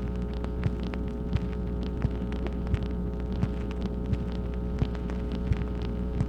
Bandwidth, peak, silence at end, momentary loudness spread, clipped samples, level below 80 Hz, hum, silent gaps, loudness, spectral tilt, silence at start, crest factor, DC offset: 6.6 kHz; -12 dBFS; 0 s; 2 LU; under 0.1%; -32 dBFS; none; none; -32 LUFS; -9 dB/octave; 0 s; 16 dB; under 0.1%